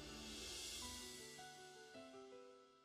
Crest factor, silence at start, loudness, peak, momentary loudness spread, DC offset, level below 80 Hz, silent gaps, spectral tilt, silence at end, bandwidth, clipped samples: 16 dB; 0 s; -53 LUFS; -40 dBFS; 12 LU; under 0.1%; -70 dBFS; none; -1.5 dB/octave; 0 s; 15.5 kHz; under 0.1%